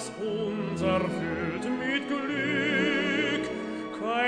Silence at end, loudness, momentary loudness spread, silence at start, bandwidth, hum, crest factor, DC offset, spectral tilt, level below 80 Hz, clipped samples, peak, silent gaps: 0 s; -28 LUFS; 8 LU; 0 s; 10.5 kHz; none; 16 dB; under 0.1%; -5 dB/octave; -58 dBFS; under 0.1%; -12 dBFS; none